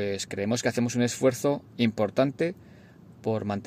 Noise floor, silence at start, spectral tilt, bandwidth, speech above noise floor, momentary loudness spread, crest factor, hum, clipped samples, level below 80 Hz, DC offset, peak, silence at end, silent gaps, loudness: -51 dBFS; 0 s; -5 dB/octave; 15.5 kHz; 24 dB; 6 LU; 18 dB; none; under 0.1%; -66 dBFS; under 0.1%; -10 dBFS; 0 s; none; -27 LUFS